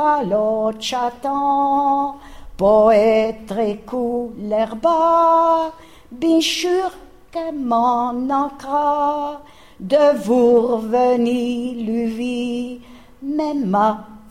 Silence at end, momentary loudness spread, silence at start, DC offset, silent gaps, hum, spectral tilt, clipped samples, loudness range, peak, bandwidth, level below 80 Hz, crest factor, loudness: 0.15 s; 12 LU; 0 s; 0.3%; none; none; -5 dB/octave; under 0.1%; 3 LU; -4 dBFS; 15.5 kHz; -48 dBFS; 16 dB; -18 LUFS